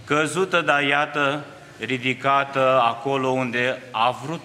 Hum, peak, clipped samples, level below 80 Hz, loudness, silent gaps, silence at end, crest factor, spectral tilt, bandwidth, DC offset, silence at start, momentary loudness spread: none; -2 dBFS; under 0.1%; -68 dBFS; -21 LUFS; none; 0 s; 20 dB; -4.5 dB/octave; 14.5 kHz; under 0.1%; 0 s; 6 LU